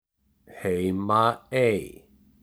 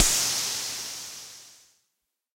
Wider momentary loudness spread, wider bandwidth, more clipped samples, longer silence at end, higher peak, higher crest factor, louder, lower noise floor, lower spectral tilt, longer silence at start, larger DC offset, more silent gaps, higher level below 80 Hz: second, 10 LU vs 20 LU; first, over 20 kHz vs 16 kHz; neither; second, 0.5 s vs 0.8 s; about the same, -6 dBFS vs -4 dBFS; second, 20 dB vs 26 dB; about the same, -25 LUFS vs -26 LUFS; second, -57 dBFS vs -81 dBFS; first, -6.5 dB/octave vs 0.5 dB/octave; first, 0.5 s vs 0 s; neither; neither; second, -60 dBFS vs -44 dBFS